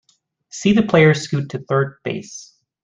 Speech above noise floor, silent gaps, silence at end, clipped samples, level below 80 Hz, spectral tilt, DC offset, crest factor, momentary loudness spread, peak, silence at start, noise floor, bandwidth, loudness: 41 dB; none; 0.4 s; under 0.1%; -54 dBFS; -6 dB/octave; under 0.1%; 16 dB; 21 LU; -2 dBFS; 0.55 s; -59 dBFS; 9.6 kHz; -18 LUFS